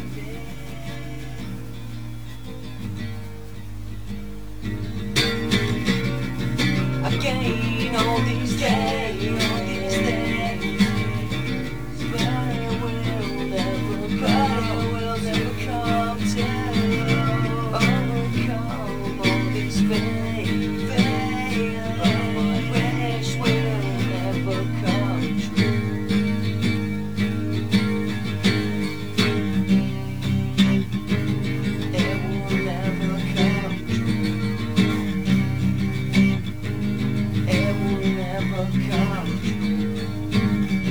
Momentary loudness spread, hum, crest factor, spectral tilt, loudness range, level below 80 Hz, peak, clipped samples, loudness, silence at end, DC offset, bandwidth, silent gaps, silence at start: 12 LU; none; 20 dB; -6 dB/octave; 3 LU; -40 dBFS; -4 dBFS; under 0.1%; -23 LUFS; 0 s; 2%; over 20 kHz; none; 0 s